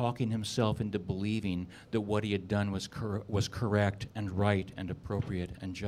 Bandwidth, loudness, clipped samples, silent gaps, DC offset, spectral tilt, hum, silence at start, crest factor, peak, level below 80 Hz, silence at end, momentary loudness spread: 14 kHz; -33 LUFS; under 0.1%; none; under 0.1%; -6.5 dB/octave; none; 0 s; 20 dB; -12 dBFS; -54 dBFS; 0 s; 7 LU